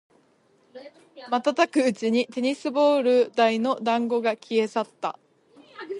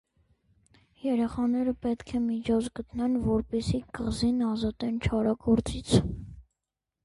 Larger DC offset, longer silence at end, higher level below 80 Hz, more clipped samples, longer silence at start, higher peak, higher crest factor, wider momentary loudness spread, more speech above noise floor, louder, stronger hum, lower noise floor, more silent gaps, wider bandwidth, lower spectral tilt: neither; second, 0 s vs 0.65 s; second, -78 dBFS vs -44 dBFS; neither; second, 0.75 s vs 1.05 s; about the same, -6 dBFS vs -8 dBFS; about the same, 18 dB vs 20 dB; about the same, 8 LU vs 7 LU; second, 39 dB vs 60 dB; first, -24 LUFS vs -29 LUFS; neither; second, -62 dBFS vs -87 dBFS; neither; about the same, 11.5 kHz vs 11.5 kHz; second, -4.5 dB/octave vs -6.5 dB/octave